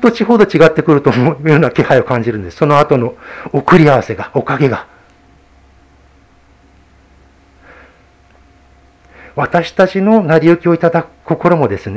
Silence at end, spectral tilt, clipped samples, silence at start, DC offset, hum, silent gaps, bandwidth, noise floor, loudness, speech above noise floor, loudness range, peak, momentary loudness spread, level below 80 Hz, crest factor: 0 s; -8 dB/octave; 0.5%; 0 s; under 0.1%; none; none; 8 kHz; -47 dBFS; -12 LUFS; 36 dB; 11 LU; 0 dBFS; 11 LU; -44 dBFS; 12 dB